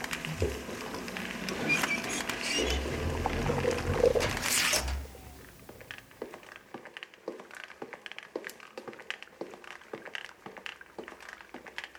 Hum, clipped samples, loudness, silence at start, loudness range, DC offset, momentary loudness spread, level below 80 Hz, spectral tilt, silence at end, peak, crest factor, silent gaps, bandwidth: none; under 0.1%; -32 LUFS; 0 s; 15 LU; under 0.1%; 19 LU; -46 dBFS; -3 dB/octave; 0 s; -10 dBFS; 24 dB; none; over 20 kHz